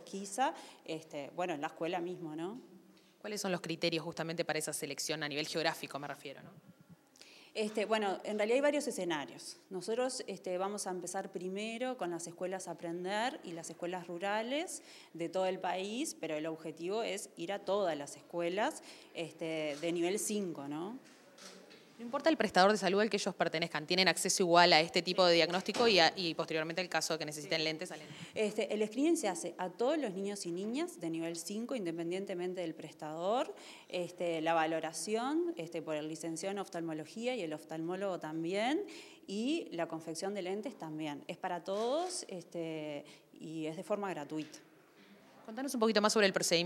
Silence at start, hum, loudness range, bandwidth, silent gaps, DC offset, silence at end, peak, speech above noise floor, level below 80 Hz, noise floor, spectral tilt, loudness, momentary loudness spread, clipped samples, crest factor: 0 s; none; 10 LU; 16.5 kHz; none; under 0.1%; 0 s; -10 dBFS; 26 dB; -86 dBFS; -62 dBFS; -3.5 dB/octave; -35 LUFS; 15 LU; under 0.1%; 26 dB